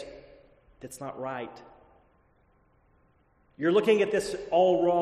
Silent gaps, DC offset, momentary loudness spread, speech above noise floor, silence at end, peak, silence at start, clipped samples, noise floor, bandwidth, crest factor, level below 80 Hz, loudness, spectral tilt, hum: none; under 0.1%; 21 LU; 39 dB; 0 s; -12 dBFS; 0 s; under 0.1%; -65 dBFS; 13 kHz; 18 dB; -64 dBFS; -26 LUFS; -5.5 dB/octave; none